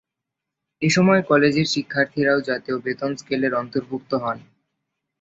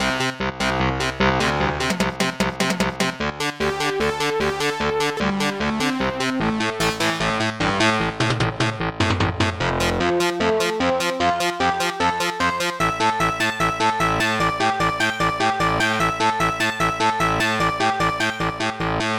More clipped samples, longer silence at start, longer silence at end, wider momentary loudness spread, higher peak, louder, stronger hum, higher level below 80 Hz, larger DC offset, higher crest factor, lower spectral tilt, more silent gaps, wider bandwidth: neither; first, 0.8 s vs 0 s; first, 0.8 s vs 0 s; first, 11 LU vs 3 LU; first, -2 dBFS vs -6 dBFS; about the same, -21 LUFS vs -21 LUFS; neither; second, -60 dBFS vs -40 dBFS; second, under 0.1% vs 0.1%; about the same, 20 dB vs 16 dB; first, -5.5 dB/octave vs -4 dB/octave; neither; second, 8 kHz vs 18 kHz